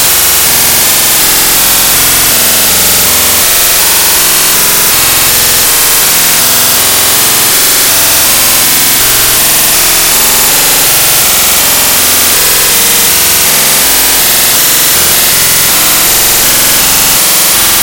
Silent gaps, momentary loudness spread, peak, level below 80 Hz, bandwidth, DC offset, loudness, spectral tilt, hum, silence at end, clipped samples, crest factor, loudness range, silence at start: none; 0 LU; 0 dBFS; -30 dBFS; over 20 kHz; under 0.1%; -3 LUFS; 0 dB/octave; none; 0 s; 4%; 6 dB; 0 LU; 0 s